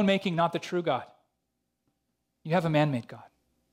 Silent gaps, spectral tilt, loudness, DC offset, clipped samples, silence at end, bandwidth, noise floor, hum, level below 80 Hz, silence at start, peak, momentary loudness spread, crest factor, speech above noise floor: none; -7 dB/octave; -28 LUFS; under 0.1%; under 0.1%; 0.5 s; 13 kHz; -81 dBFS; none; -70 dBFS; 0 s; -12 dBFS; 11 LU; 18 dB; 53 dB